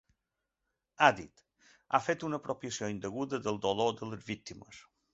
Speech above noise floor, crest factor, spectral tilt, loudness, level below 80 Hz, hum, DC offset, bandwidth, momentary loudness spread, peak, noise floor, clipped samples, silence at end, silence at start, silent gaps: 53 dB; 28 dB; -3 dB/octave; -33 LUFS; -68 dBFS; none; under 0.1%; 8 kHz; 18 LU; -6 dBFS; -86 dBFS; under 0.1%; 0.35 s; 1 s; none